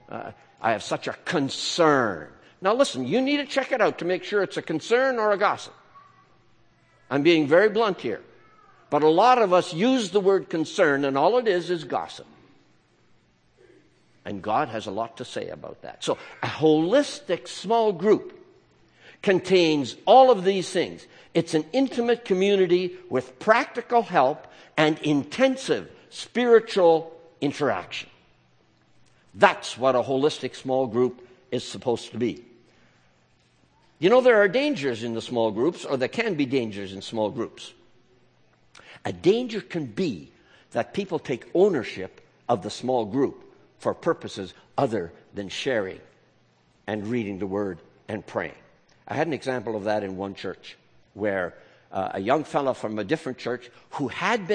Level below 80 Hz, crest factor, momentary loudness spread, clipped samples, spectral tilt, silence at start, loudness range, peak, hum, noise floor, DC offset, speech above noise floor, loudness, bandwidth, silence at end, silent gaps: -68 dBFS; 24 dB; 16 LU; under 0.1%; -5 dB/octave; 0.1 s; 9 LU; 0 dBFS; none; -62 dBFS; under 0.1%; 39 dB; -24 LUFS; 9.8 kHz; 0 s; none